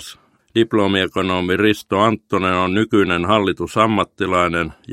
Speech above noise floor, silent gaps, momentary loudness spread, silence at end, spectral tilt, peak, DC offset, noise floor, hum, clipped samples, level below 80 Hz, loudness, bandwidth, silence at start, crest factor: 24 dB; none; 4 LU; 0 s; -5.5 dB/octave; 0 dBFS; under 0.1%; -42 dBFS; none; under 0.1%; -48 dBFS; -17 LUFS; 16 kHz; 0 s; 18 dB